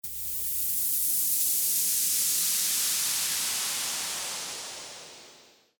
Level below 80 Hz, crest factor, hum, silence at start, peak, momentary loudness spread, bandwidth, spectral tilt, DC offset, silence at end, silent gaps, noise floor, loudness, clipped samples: -64 dBFS; 16 dB; none; 0.05 s; -14 dBFS; 13 LU; over 20 kHz; 2 dB/octave; under 0.1%; 0.4 s; none; -56 dBFS; -25 LUFS; under 0.1%